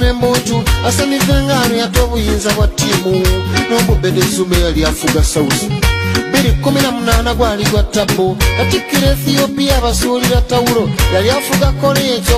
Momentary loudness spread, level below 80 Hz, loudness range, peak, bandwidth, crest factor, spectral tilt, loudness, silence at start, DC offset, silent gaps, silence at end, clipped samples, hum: 2 LU; -18 dBFS; 1 LU; 0 dBFS; 15.5 kHz; 12 dB; -4.5 dB/octave; -13 LUFS; 0 s; under 0.1%; none; 0 s; under 0.1%; none